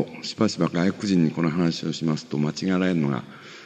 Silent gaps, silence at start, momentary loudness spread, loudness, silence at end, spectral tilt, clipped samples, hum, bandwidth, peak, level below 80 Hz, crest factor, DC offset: none; 0 s; 5 LU; -24 LUFS; 0 s; -6 dB/octave; under 0.1%; none; 9 kHz; -6 dBFS; -62 dBFS; 16 dB; under 0.1%